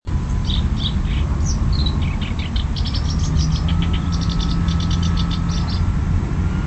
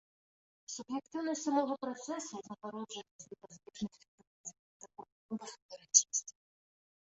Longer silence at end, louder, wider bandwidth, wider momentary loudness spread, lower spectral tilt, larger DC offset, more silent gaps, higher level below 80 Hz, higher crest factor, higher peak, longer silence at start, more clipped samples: second, 0 s vs 0.7 s; first, -21 LUFS vs -35 LUFS; about the same, 8.4 kHz vs 8 kHz; second, 3 LU vs 26 LU; first, -6 dB/octave vs -3 dB/octave; neither; second, none vs 3.11-3.19 s, 4.08-4.18 s, 4.27-4.44 s, 4.59-4.80 s, 5.12-5.29 s, 5.62-5.69 s; first, -22 dBFS vs -80 dBFS; second, 12 dB vs 32 dB; about the same, -6 dBFS vs -8 dBFS; second, 0.05 s vs 0.7 s; neither